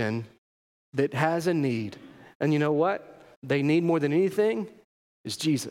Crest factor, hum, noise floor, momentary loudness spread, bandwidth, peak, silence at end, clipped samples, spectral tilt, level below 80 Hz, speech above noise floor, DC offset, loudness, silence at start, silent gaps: 18 dB; none; under -90 dBFS; 16 LU; 16.5 kHz; -10 dBFS; 0 s; under 0.1%; -6 dB/octave; -74 dBFS; over 64 dB; under 0.1%; -26 LUFS; 0 s; 0.38-0.92 s, 2.35-2.40 s, 3.37-3.42 s, 4.84-5.24 s